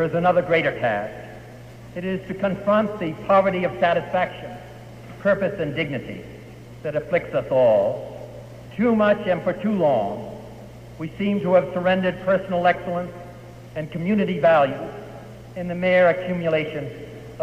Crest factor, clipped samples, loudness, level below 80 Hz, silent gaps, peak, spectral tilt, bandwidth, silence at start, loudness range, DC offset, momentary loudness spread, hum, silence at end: 18 dB; under 0.1%; -22 LUFS; -52 dBFS; none; -4 dBFS; -7.5 dB/octave; 14.5 kHz; 0 s; 3 LU; under 0.1%; 21 LU; none; 0 s